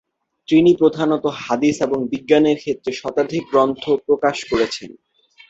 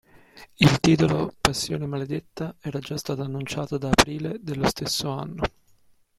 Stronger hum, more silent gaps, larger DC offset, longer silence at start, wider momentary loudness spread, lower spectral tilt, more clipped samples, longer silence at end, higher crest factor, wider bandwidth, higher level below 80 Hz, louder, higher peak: neither; neither; neither; first, 0.5 s vs 0.35 s; second, 8 LU vs 12 LU; about the same, -5.5 dB/octave vs -4.5 dB/octave; neither; second, 0.55 s vs 0.7 s; second, 16 dB vs 26 dB; second, 8 kHz vs 16 kHz; second, -54 dBFS vs -44 dBFS; first, -18 LUFS vs -24 LUFS; about the same, -2 dBFS vs 0 dBFS